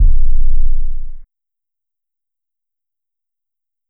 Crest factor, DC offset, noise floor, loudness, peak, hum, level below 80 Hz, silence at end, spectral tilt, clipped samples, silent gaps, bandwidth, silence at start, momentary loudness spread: 10 dB; under 0.1%; -87 dBFS; -21 LUFS; -2 dBFS; none; -14 dBFS; 2.65 s; -14.5 dB/octave; under 0.1%; none; 0.3 kHz; 0 s; 14 LU